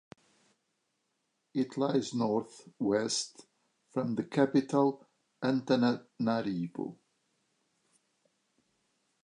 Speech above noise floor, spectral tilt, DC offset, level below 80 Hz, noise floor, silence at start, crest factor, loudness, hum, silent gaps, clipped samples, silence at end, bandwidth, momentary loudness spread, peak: 49 dB; -5.5 dB/octave; under 0.1%; -78 dBFS; -80 dBFS; 1.55 s; 22 dB; -32 LUFS; none; none; under 0.1%; 2.3 s; 11 kHz; 11 LU; -12 dBFS